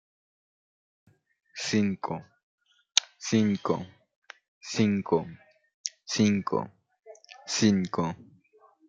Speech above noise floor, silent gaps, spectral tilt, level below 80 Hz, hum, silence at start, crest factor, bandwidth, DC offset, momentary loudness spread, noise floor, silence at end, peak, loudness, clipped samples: 35 dB; 2.43-2.58 s, 4.15-4.22 s, 4.48-4.61 s, 5.74-5.84 s; -4.5 dB/octave; -70 dBFS; none; 1.55 s; 30 dB; 9.2 kHz; under 0.1%; 20 LU; -61 dBFS; 0.65 s; 0 dBFS; -28 LUFS; under 0.1%